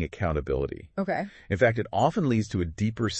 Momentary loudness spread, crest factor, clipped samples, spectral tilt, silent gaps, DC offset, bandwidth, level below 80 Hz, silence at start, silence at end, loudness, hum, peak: 8 LU; 20 dB; under 0.1%; -6.5 dB/octave; none; under 0.1%; 8.6 kHz; -44 dBFS; 0 s; 0 s; -27 LUFS; none; -8 dBFS